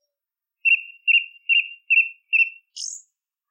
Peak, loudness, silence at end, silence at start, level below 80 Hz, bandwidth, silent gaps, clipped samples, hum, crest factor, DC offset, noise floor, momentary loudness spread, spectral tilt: -8 dBFS; -19 LUFS; 0.5 s; 0.65 s; under -90 dBFS; 9.6 kHz; none; under 0.1%; none; 14 dB; under 0.1%; -87 dBFS; 14 LU; 12 dB/octave